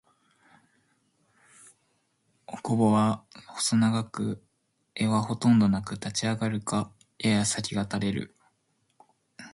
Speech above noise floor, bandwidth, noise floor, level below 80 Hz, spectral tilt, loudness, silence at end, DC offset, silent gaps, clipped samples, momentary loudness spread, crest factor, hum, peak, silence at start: 48 dB; 11.5 kHz; -74 dBFS; -60 dBFS; -5 dB/octave; -27 LUFS; 0.05 s; under 0.1%; none; under 0.1%; 17 LU; 18 dB; none; -12 dBFS; 2.5 s